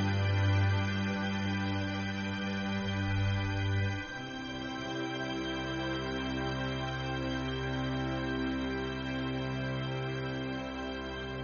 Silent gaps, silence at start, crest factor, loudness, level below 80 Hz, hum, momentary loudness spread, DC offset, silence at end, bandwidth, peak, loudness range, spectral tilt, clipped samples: none; 0 s; 14 dB; -34 LUFS; -50 dBFS; none; 7 LU; under 0.1%; 0 s; 6.8 kHz; -18 dBFS; 3 LU; -5 dB/octave; under 0.1%